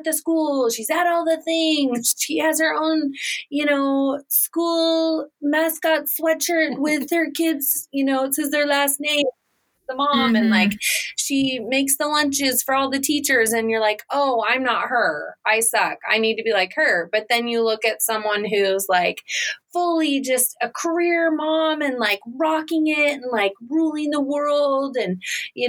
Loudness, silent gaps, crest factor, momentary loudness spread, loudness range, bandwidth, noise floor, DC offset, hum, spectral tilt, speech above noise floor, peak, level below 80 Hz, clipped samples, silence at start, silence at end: -20 LUFS; none; 18 dB; 4 LU; 2 LU; 20 kHz; -69 dBFS; under 0.1%; none; -2 dB/octave; 48 dB; -2 dBFS; -70 dBFS; under 0.1%; 0 s; 0 s